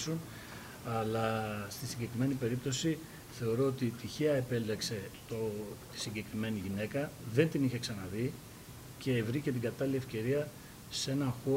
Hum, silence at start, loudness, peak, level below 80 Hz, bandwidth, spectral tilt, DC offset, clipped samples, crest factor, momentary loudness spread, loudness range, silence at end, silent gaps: none; 0 s; -36 LUFS; -16 dBFS; -62 dBFS; 16 kHz; -5.5 dB/octave; under 0.1%; under 0.1%; 20 dB; 11 LU; 2 LU; 0 s; none